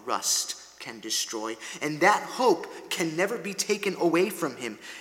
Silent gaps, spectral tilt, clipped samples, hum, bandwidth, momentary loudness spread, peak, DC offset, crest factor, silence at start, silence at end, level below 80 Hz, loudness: none; -2.5 dB/octave; under 0.1%; none; 17.5 kHz; 13 LU; -6 dBFS; under 0.1%; 22 dB; 0 s; 0 s; -76 dBFS; -27 LUFS